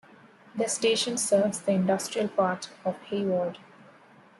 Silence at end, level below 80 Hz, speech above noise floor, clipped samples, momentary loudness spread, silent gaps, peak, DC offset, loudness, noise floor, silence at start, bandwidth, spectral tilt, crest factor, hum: 0.8 s; -74 dBFS; 28 dB; under 0.1%; 10 LU; none; -12 dBFS; under 0.1%; -27 LUFS; -55 dBFS; 0.55 s; 12.5 kHz; -4 dB/octave; 18 dB; none